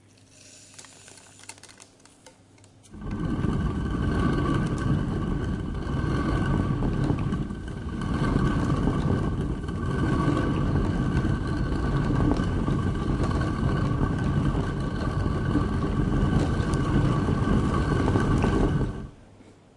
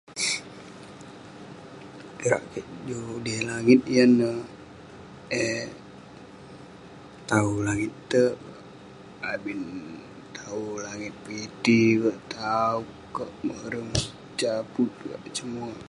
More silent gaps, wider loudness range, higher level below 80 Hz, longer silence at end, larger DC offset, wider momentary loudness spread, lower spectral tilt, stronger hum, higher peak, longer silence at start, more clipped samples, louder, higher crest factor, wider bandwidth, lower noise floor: neither; about the same, 5 LU vs 7 LU; first, -34 dBFS vs -56 dBFS; first, 0.25 s vs 0.05 s; neither; second, 10 LU vs 25 LU; first, -7.5 dB/octave vs -5 dB/octave; neither; about the same, -6 dBFS vs -6 dBFS; first, 0.45 s vs 0.1 s; neither; about the same, -26 LUFS vs -26 LUFS; about the same, 18 dB vs 22 dB; about the same, 11.5 kHz vs 11.5 kHz; first, -54 dBFS vs -46 dBFS